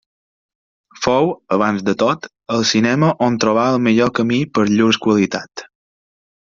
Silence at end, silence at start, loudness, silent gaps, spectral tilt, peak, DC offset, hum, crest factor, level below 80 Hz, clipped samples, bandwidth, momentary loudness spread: 0.9 s; 1 s; -16 LUFS; none; -5 dB/octave; -2 dBFS; under 0.1%; none; 16 dB; -54 dBFS; under 0.1%; 7.6 kHz; 8 LU